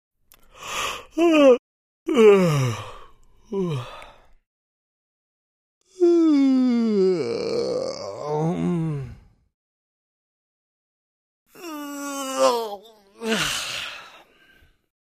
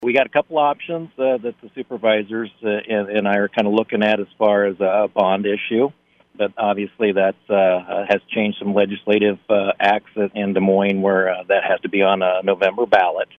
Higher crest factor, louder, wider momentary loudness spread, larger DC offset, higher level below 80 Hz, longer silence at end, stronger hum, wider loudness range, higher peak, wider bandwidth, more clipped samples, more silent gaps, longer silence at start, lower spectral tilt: about the same, 20 dB vs 16 dB; about the same, -21 LUFS vs -19 LUFS; first, 19 LU vs 7 LU; neither; first, -56 dBFS vs -66 dBFS; first, 1 s vs 0.15 s; neither; first, 13 LU vs 3 LU; about the same, -4 dBFS vs -2 dBFS; first, 15.5 kHz vs 6.4 kHz; neither; first, 1.59-2.06 s, 4.47-5.81 s, 9.54-11.46 s vs none; first, 0.6 s vs 0 s; second, -5.5 dB/octave vs -7.5 dB/octave